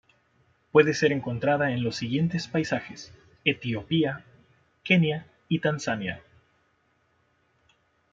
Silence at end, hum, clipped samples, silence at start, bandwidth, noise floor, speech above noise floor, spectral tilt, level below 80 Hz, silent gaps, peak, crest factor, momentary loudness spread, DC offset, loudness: 1.95 s; none; under 0.1%; 0.75 s; 7.6 kHz; -69 dBFS; 43 dB; -6 dB/octave; -64 dBFS; none; -4 dBFS; 24 dB; 17 LU; under 0.1%; -26 LUFS